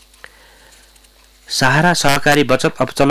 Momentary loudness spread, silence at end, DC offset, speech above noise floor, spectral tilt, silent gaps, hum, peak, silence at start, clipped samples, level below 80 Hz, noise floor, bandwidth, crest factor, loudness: 5 LU; 0 s; under 0.1%; 35 dB; -4 dB/octave; none; none; -4 dBFS; 1.5 s; under 0.1%; -42 dBFS; -48 dBFS; 16 kHz; 12 dB; -14 LUFS